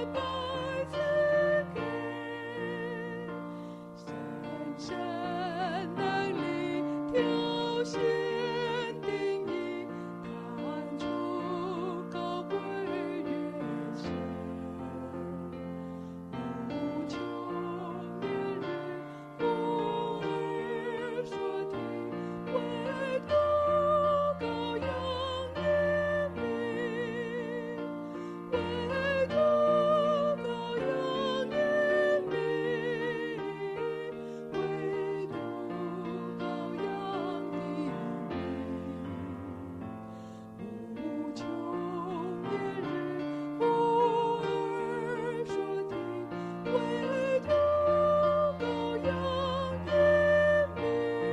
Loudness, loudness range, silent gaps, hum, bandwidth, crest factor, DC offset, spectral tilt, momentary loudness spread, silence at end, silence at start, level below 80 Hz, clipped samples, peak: -32 LUFS; 9 LU; none; none; 10.5 kHz; 16 dB; under 0.1%; -6.5 dB/octave; 13 LU; 0 s; 0 s; -60 dBFS; under 0.1%; -16 dBFS